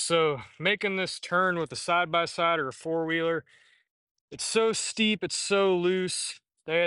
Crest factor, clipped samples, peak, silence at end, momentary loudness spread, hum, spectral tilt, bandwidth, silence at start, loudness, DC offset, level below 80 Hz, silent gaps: 18 dB; under 0.1%; -10 dBFS; 0 s; 6 LU; none; -3 dB/octave; 11.5 kHz; 0 s; -27 LUFS; under 0.1%; -68 dBFS; 3.91-4.15 s, 4.21-4.28 s